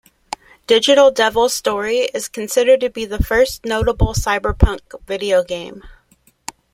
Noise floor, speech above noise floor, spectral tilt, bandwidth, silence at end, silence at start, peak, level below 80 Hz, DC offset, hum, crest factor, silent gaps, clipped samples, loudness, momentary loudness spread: -56 dBFS; 40 dB; -4 dB/octave; 16.5 kHz; 0.85 s; 0.7 s; -2 dBFS; -28 dBFS; under 0.1%; none; 16 dB; none; under 0.1%; -16 LUFS; 20 LU